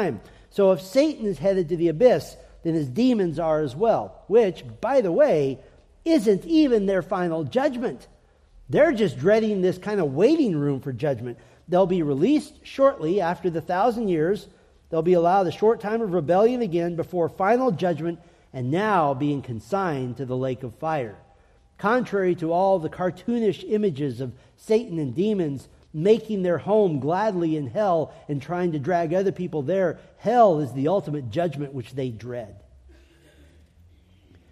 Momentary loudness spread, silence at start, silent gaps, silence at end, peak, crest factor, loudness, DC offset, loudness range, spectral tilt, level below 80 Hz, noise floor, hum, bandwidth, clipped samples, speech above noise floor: 11 LU; 0 s; none; 1.9 s; -4 dBFS; 18 dB; -23 LUFS; under 0.1%; 4 LU; -7.5 dB/octave; -56 dBFS; -56 dBFS; none; 14 kHz; under 0.1%; 34 dB